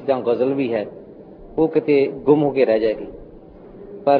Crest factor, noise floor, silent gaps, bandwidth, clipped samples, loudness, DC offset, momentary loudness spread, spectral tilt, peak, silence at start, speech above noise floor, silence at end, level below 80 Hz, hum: 18 dB; -41 dBFS; none; 5 kHz; under 0.1%; -19 LUFS; under 0.1%; 16 LU; -10.5 dB/octave; -2 dBFS; 0 s; 23 dB; 0 s; -50 dBFS; none